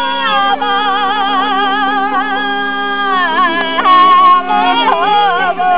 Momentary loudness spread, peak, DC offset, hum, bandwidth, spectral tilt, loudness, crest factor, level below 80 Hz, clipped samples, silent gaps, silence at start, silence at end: 7 LU; 0 dBFS; 4%; none; 4 kHz; -6.5 dB/octave; -11 LUFS; 12 dB; -58 dBFS; under 0.1%; none; 0 s; 0 s